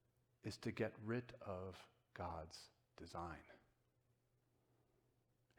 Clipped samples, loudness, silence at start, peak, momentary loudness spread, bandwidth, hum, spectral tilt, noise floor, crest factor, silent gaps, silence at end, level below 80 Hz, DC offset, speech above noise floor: under 0.1%; -50 LUFS; 0.45 s; -30 dBFS; 16 LU; 17.5 kHz; none; -6 dB/octave; -82 dBFS; 24 dB; none; 2 s; -72 dBFS; under 0.1%; 33 dB